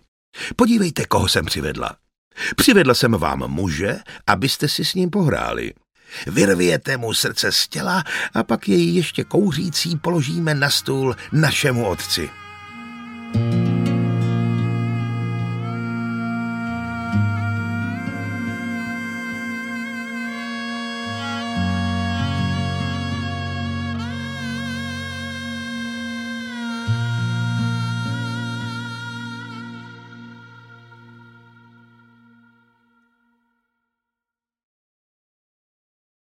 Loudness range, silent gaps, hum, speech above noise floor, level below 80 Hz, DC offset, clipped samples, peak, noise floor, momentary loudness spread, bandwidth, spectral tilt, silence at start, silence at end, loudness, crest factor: 8 LU; 2.18-2.31 s; none; 69 dB; -48 dBFS; under 0.1%; under 0.1%; -2 dBFS; -88 dBFS; 12 LU; 16.5 kHz; -5 dB/octave; 0.35 s; 5.05 s; -21 LUFS; 20 dB